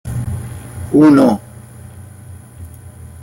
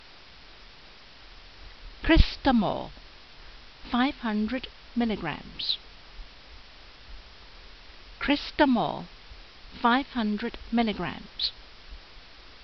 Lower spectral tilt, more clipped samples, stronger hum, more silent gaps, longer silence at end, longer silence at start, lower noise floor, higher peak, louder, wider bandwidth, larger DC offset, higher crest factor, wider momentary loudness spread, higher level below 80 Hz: first, -8 dB/octave vs -3.5 dB/octave; neither; neither; neither; about the same, 0.15 s vs 0.15 s; second, 0.05 s vs 0.6 s; second, -36 dBFS vs -51 dBFS; about the same, -2 dBFS vs -4 dBFS; first, -13 LUFS vs -27 LUFS; first, 16.5 kHz vs 6.2 kHz; second, under 0.1% vs 0.2%; second, 14 dB vs 26 dB; about the same, 27 LU vs 25 LU; about the same, -42 dBFS vs -38 dBFS